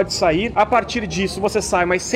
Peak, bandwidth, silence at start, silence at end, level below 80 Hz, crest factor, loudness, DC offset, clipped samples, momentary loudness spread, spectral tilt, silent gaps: -4 dBFS; 16 kHz; 0 s; 0 s; -38 dBFS; 14 dB; -19 LUFS; under 0.1%; under 0.1%; 5 LU; -4 dB/octave; none